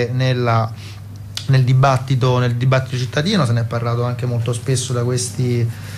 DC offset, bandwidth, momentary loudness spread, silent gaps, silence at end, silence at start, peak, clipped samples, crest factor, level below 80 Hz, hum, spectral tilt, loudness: under 0.1%; 13 kHz; 9 LU; none; 0 s; 0 s; -6 dBFS; under 0.1%; 12 dB; -48 dBFS; none; -6 dB/octave; -18 LUFS